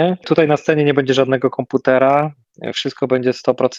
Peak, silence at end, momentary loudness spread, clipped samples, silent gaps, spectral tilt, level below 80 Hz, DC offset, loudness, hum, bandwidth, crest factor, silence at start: 0 dBFS; 0 s; 9 LU; under 0.1%; none; -6 dB/octave; -62 dBFS; under 0.1%; -16 LUFS; none; 7.8 kHz; 16 dB; 0 s